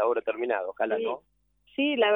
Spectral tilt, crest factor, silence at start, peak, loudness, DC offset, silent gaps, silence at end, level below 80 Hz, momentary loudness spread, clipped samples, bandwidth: -7 dB/octave; 16 dB; 0 s; -12 dBFS; -29 LUFS; under 0.1%; none; 0 s; -72 dBFS; 10 LU; under 0.1%; 3.9 kHz